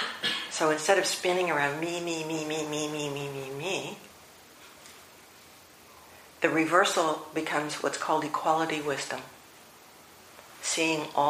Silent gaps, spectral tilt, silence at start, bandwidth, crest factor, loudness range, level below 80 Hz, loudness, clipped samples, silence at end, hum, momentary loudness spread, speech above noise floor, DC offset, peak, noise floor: none; -3 dB/octave; 0 s; 15.5 kHz; 24 dB; 9 LU; -74 dBFS; -28 LUFS; under 0.1%; 0 s; none; 23 LU; 25 dB; under 0.1%; -8 dBFS; -53 dBFS